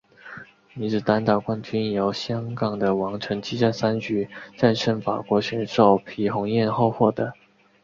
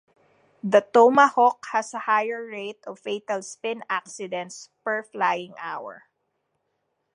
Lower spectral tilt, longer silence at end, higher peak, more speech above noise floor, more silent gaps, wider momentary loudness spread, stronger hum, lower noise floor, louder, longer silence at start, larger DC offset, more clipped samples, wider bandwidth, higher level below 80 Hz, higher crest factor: first, -7 dB/octave vs -4 dB/octave; second, 0.5 s vs 1.2 s; about the same, -2 dBFS vs -2 dBFS; second, 20 dB vs 52 dB; neither; second, 11 LU vs 18 LU; neither; second, -43 dBFS vs -76 dBFS; about the same, -23 LUFS vs -23 LUFS; second, 0.25 s vs 0.65 s; neither; neither; second, 7.4 kHz vs 11 kHz; first, -58 dBFS vs -82 dBFS; about the same, 20 dB vs 22 dB